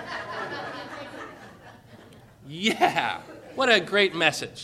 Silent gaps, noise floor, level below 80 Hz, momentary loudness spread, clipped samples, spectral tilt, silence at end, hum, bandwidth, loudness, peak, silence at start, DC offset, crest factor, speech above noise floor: none; -50 dBFS; -66 dBFS; 20 LU; under 0.1%; -3 dB/octave; 0 s; none; 15 kHz; -24 LUFS; -4 dBFS; 0 s; under 0.1%; 24 dB; 26 dB